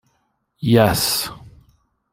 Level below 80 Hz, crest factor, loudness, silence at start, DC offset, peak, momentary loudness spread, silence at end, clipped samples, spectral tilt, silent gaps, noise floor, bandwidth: -46 dBFS; 18 dB; -18 LUFS; 0.6 s; under 0.1%; -2 dBFS; 12 LU; 0.65 s; under 0.1%; -4.5 dB/octave; none; -68 dBFS; 16.5 kHz